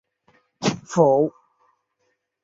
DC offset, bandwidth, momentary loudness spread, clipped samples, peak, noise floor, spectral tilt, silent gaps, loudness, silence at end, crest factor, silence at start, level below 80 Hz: under 0.1%; 7.8 kHz; 9 LU; under 0.1%; -2 dBFS; -72 dBFS; -6 dB/octave; none; -21 LUFS; 1.15 s; 22 dB; 0.6 s; -66 dBFS